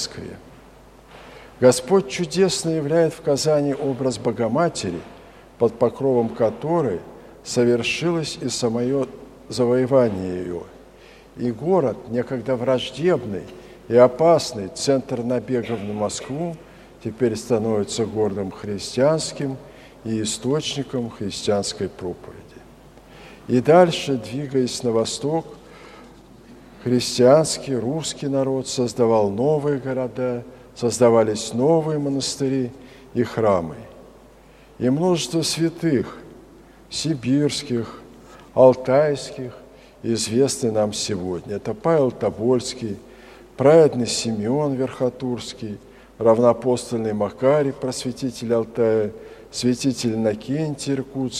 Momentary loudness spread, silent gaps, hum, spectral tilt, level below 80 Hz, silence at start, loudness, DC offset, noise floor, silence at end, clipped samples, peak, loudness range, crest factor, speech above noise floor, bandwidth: 15 LU; none; none; -5 dB/octave; -54 dBFS; 0 s; -21 LUFS; under 0.1%; -48 dBFS; 0 s; under 0.1%; 0 dBFS; 4 LU; 22 dB; 28 dB; 14 kHz